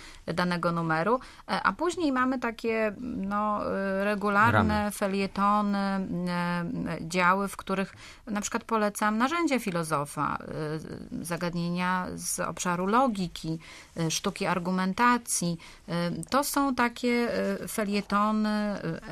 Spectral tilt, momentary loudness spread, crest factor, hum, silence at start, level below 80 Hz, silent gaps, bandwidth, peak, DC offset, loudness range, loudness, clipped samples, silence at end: -5 dB/octave; 9 LU; 20 dB; none; 0 s; -54 dBFS; none; 14.5 kHz; -8 dBFS; under 0.1%; 3 LU; -28 LUFS; under 0.1%; 0 s